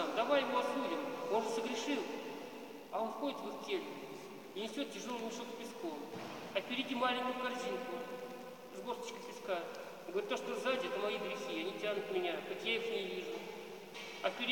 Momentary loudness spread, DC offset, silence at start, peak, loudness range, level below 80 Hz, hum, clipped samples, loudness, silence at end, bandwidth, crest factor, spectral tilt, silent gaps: 12 LU; under 0.1%; 0 s; -18 dBFS; 4 LU; -88 dBFS; none; under 0.1%; -40 LUFS; 0 s; 17 kHz; 20 dB; -3.5 dB/octave; none